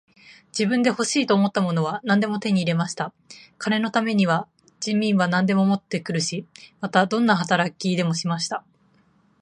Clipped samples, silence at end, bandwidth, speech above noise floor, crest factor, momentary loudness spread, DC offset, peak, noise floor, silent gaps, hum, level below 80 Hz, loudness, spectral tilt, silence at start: under 0.1%; 0.8 s; 10.5 kHz; 38 dB; 20 dB; 11 LU; under 0.1%; -4 dBFS; -60 dBFS; none; none; -68 dBFS; -22 LUFS; -5 dB/octave; 0.3 s